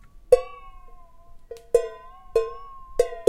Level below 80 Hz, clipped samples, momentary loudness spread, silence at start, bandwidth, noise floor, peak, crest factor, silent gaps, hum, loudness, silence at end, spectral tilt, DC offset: -44 dBFS; under 0.1%; 23 LU; 0.3 s; 16 kHz; -45 dBFS; -2 dBFS; 24 dB; none; none; -25 LUFS; 0.05 s; -4 dB/octave; under 0.1%